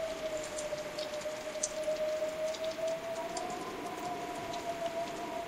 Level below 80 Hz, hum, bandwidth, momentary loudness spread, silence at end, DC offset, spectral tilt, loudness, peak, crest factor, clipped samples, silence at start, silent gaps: -64 dBFS; none; 16 kHz; 5 LU; 0 s; under 0.1%; -2.5 dB/octave; -37 LUFS; -12 dBFS; 26 dB; under 0.1%; 0 s; none